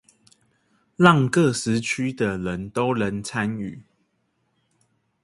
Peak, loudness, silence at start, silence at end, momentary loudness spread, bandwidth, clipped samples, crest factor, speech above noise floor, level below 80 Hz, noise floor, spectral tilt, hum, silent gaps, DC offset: 0 dBFS; -22 LUFS; 1 s; 1.45 s; 11 LU; 11.5 kHz; under 0.1%; 24 dB; 49 dB; -54 dBFS; -71 dBFS; -5.5 dB/octave; none; none; under 0.1%